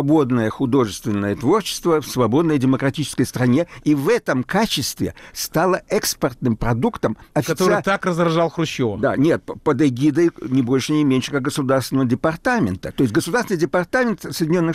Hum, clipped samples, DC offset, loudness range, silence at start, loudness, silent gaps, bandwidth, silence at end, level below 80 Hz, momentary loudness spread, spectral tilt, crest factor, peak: none; under 0.1%; under 0.1%; 2 LU; 0 s; -19 LUFS; none; 16 kHz; 0 s; -44 dBFS; 5 LU; -5.5 dB/octave; 12 dB; -8 dBFS